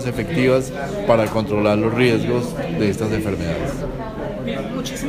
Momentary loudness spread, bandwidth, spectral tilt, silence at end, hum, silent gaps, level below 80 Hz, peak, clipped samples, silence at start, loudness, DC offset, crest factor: 9 LU; 15.5 kHz; -6.5 dB/octave; 0 s; none; none; -38 dBFS; -2 dBFS; under 0.1%; 0 s; -20 LUFS; under 0.1%; 18 dB